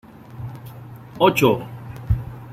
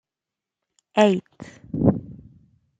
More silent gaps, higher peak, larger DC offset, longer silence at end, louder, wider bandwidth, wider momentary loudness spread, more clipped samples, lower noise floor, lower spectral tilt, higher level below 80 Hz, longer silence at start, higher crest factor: neither; about the same, -2 dBFS vs -2 dBFS; neither; second, 0 s vs 0.65 s; about the same, -20 LUFS vs -22 LUFS; first, 16 kHz vs 9.2 kHz; about the same, 23 LU vs 25 LU; neither; second, -38 dBFS vs -88 dBFS; about the same, -6 dB/octave vs -7 dB/octave; first, -38 dBFS vs -50 dBFS; second, 0.3 s vs 0.95 s; about the same, 20 dB vs 22 dB